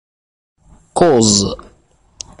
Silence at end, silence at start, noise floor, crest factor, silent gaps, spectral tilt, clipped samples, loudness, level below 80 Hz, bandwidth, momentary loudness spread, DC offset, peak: 0.85 s; 0.95 s; -53 dBFS; 18 dB; none; -4 dB/octave; under 0.1%; -13 LUFS; -42 dBFS; 11.5 kHz; 23 LU; under 0.1%; 0 dBFS